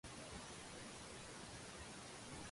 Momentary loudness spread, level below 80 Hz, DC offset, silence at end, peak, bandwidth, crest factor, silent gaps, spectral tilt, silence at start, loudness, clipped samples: 1 LU; -66 dBFS; under 0.1%; 0 s; -40 dBFS; 11.5 kHz; 14 dB; none; -3 dB/octave; 0.05 s; -53 LUFS; under 0.1%